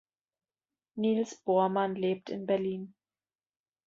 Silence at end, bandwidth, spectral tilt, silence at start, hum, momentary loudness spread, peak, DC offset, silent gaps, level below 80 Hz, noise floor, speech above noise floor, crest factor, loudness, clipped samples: 1 s; 7.8 kHz; -6.5 dB/octave; 0.95 s; none; 13 LU; -16 dBFS; under 0.1%; none; -78 dBFS; under -90 dBFS; over 60 dB; 18 dB; -31 LUFS; under 0.1%